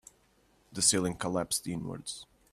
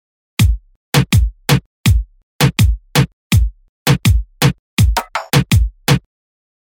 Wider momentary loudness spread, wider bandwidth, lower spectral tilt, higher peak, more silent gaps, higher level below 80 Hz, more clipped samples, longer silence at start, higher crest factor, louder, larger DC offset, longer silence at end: first, 17 LU vs 6 LU; second, 15.5 kHz vs 19.5 kHz; second, -3 dB/octave vs -5 dB/octave; second, -12 dBFS vs -2 dBFS; second, none vs 0.76-0.92 s, 1.66-1.84 s, 2.23-2.39 s, 3.13-3.30 s, 3.69-3.86 s, 4.59-4.77 s; second, -62 dBFS vs -20 dBFS; neither; first, 0.7 s vs 0.4 s; first, 22 dB vs 14 dB; second, -30 LUFS vs -16 LUFS; neither; second, 0.3 s vs 0.65 s